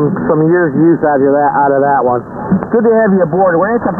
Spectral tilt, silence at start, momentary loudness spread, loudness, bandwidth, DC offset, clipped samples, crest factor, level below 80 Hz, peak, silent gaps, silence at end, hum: -12.5 dB/octave; 0 s; 4 LU; -11 LUFS; 2.3 kHz; under 0.1%; under 0.1%; 10 dB; -44 dBFS; 0 dBFS; none; 0 s; none